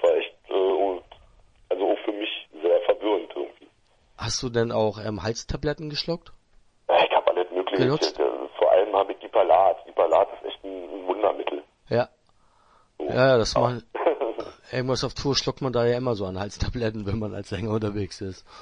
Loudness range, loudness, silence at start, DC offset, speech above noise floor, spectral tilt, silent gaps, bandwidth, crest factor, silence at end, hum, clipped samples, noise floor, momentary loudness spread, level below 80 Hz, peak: 5 LU; -25 LUFS; 0 s; under 0.1%; 36 dB; -5 dB/octave; none; 10.5 kHz; 20 dB; 0 s; none; under 0.1%; -61 dBFS; 13 LU; -48 dBFS; -6 dBFS